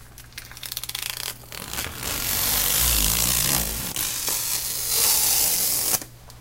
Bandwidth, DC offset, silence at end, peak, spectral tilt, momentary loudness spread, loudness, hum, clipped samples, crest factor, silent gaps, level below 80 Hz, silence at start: 17 kHz; under 0.1%; 0 s; -2 dBFS; -0.5 dB/octave; 15 LU; -21 LUFS; none; under 0.1%; 24 dB; none; -38 dBFS; 0 s